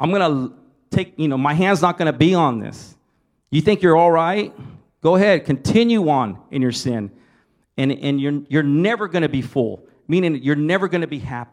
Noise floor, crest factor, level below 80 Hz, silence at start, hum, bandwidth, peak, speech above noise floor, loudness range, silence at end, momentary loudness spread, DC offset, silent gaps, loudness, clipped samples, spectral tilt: -65 dBFS; 18 dB; -54 dBFS; 0 s; none; 12.5 kHz; -2 dBFS; 48 dB; 4 LU; 0.1 s; 11 LU; under 0.1%; none; -18 LUFS; under 0.1%; -6.5 dB/octave